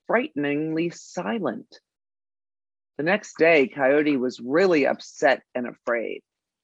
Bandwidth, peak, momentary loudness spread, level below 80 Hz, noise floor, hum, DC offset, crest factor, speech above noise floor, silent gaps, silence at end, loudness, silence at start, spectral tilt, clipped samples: 8 kHz; -6 dBFS; 13 LU; -78 dBFS; under -90 dBFS; none; under 0.1%; 18 dB; over 67 dB; none; 0.45 s; -23 LUFS; 0.1 s; -5.5 dB/octave; under 0.1%